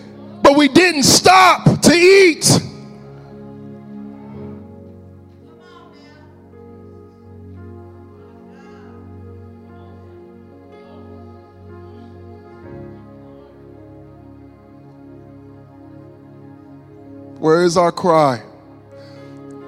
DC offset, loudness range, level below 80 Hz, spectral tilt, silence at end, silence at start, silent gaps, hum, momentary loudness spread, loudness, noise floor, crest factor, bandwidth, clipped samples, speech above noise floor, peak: under 0.1%; 28 LU; -50 dBFS; -4 dB/octave; 0.15 s; 0.3 s; none; none; 29 LU; -12 LUFS; -43 dBFS; 18 dB; 16 kHz; under 0.1%; 31 dB; 0 dBFS